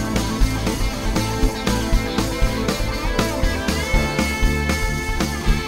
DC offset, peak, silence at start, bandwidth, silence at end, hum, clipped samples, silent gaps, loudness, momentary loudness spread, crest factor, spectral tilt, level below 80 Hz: 0.8%; -2 dBFS; 0 s; 16.5 kHz; 0 s; none; under 0.1%; none; -21 LUFS; 2 LU; 18 dB; -4.5 dB/octave; -22 dBFS